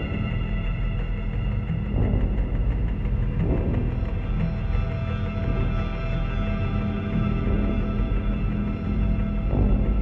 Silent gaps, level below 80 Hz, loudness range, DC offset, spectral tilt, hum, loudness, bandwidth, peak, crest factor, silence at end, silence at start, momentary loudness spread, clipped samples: none; -26 dBFS; 1 LU; under 0.1%; -10 dB/octave; none; -26 LUFS; 4.3 kHz; -10 dBFS; 14 dB; 0 s; 0 s; 4 LU; under 0.1%